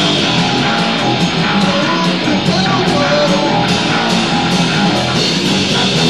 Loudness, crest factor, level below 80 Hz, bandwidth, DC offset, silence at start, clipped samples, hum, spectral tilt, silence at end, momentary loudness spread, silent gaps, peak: -12 LUFS; 12 dB; -44 dBFS; 12.5 kHz; 0.8%; 0 s; under 0.1%; none; -4.5 dB/octave; 0 s; 1 LU; none; 0 dBFS